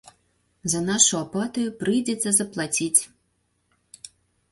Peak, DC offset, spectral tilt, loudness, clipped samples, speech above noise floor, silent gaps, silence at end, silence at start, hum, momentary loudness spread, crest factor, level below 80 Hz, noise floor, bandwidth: -2 dBFS; under 0.1%; -2.5 dB/octave; -22 LUFS; under 0.1%; 47 dB; none; 1.45 s; 0.65 s; 60 Hz at -50 dBFS; 23 LU; 24 dB; -62 dBFS; -71 dBFS; 12 kHz